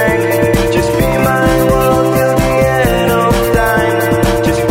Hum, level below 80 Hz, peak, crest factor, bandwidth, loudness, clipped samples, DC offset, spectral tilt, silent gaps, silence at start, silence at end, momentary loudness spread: none; -24 dBFS; 0 dBFS; 10 dB; 16.5 kHz; -11 LUFS; under 0.1%; under 0.1%; -5.5 dB/octave; none; 0 s; 0 s; 2 LU